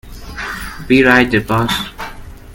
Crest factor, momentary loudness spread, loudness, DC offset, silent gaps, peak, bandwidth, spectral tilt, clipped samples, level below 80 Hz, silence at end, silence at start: 16 dB; 20 LU; -13 LUFS; under 0.1%; none; 0 dBFS; 17.5 kHz; -5 dB/octave; under 0.1%; -34 dBFS; 0 s; 0.05 s